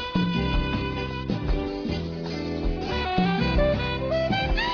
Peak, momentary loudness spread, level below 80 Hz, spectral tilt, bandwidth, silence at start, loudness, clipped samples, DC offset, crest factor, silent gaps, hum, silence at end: -8 dBFS; 7 LU; -32 dBFS; -7 dB/octave; 5.4 kHz; 0 s; -26 LUFS; under 0.1%; under 0.1%; 16 dB; none; none; 0 s